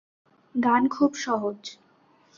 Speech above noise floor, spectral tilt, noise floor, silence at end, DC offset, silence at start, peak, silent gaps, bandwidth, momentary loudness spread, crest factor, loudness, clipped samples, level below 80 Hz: 37 dB; -4.5 dB/octave; -61 dBFS; 0.65 s; under 0.1%; 0.55 s; -8 dBFS; none; 7.6 kHz; 15 LU; 18 dB; -25 LUFS; under 0.1%; -68 dBFS